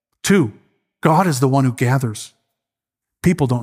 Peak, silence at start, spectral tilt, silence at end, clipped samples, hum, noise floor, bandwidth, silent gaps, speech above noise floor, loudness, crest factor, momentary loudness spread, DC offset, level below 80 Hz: 0 dBFS; 0.25 s; -6 dB/octave; 0 s; under 0.1%; none; -85 dBFS; 16 kHz; none; 69 dB; -17 LUFS; 18 dB; 10 LU; under 0.1%; -50 dBFS